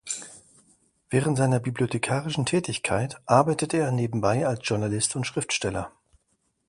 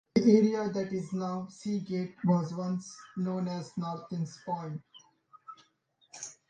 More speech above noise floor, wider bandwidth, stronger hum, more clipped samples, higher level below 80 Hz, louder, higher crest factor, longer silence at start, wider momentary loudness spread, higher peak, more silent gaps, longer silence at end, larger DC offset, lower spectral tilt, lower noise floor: first, 47 dB vs 40 dB; first, 11.5 kHz vs 9.4 kHz; neither; neither; first, -54 dBFS vs -72 dBFS; first, -25 LUFS vs -31 LUFS; about the same, 22 dB vs 22 dB; about the same, 0.05 s vs 0.15 s; second, 8 LU vs 20 LU; first, -4 dBFS vs -10 dBFS; neither; first, 0.8 s vs 0.15 s; neither; second, -5 dB/octave vs -7 dB/octave; about the same, -72 dBFS vs -71 dBFS